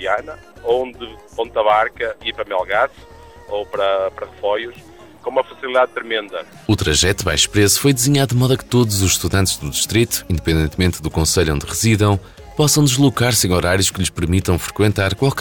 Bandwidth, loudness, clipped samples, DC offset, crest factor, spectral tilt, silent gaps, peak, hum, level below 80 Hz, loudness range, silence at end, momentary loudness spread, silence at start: over 20 kHz; -17 LUFS; under 0.1%; under 0.1%; 14 dB; -4 dB/octave; none; -2 dBFS; none; -34 dBFS; 6 LU; 0 s; 11 LU; 0 s